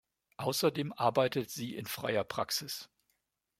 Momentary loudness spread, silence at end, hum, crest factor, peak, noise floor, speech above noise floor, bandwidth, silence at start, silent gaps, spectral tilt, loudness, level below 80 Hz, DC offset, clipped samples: 9 LU; 0.75 s; none; 22 dB; -14 dBFS; -80 dBFS; 47 dB; 16.5 kHz; 0.4 s; none; -4 dB/octave; -34 LUFS; -74 dBFS; under 0.1%; under 0.1%